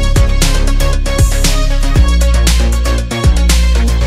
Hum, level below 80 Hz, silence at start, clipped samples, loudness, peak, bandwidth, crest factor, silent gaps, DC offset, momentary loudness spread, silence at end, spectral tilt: none; -10 dBFS; 0 s; under 0.1%; -12 LUFS; 0 dBFS; 15.5 kHz; 10 dB; none; under 0.1%; 4 LU; 0 s; -4.5 dB/octave